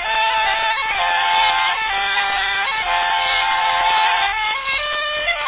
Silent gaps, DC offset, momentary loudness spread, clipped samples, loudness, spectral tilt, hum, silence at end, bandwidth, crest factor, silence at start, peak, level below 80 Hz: none; under 0.1%; 4 LU; under 0.1%; -17 LUFS; -3.5 dB/octave; none; 0 s; 4 kHz; 14 dB; 0 s; -6 dBFS; -46 dBFS